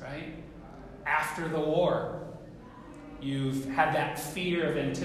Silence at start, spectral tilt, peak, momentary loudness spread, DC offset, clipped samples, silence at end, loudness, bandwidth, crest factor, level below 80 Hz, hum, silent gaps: 0 s; -5.5 dB/octave; -12 dBFS; 20 LU; under 0.1%; under 0.1%; 0 s; -30 LUFS; 15.5 kHz; 18 dB; -54 dBFS; none; none